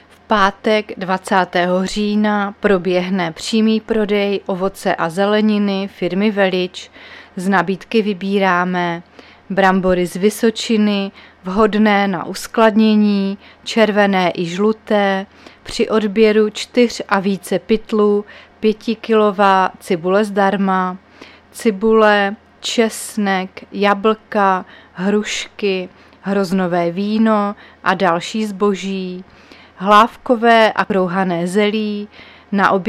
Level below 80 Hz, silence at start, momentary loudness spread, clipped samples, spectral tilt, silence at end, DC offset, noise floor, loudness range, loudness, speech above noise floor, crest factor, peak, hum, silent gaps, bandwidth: -48 dBFS; 0.3 s; 11 LU; under 0.1%; -5.5 dB/octave; 0 s; under 0.1%; -42 dBFS; 3 LU; -16 LUFS; 26 dB; 16 dB; 0 dBFS; none; none; 14.5 kHz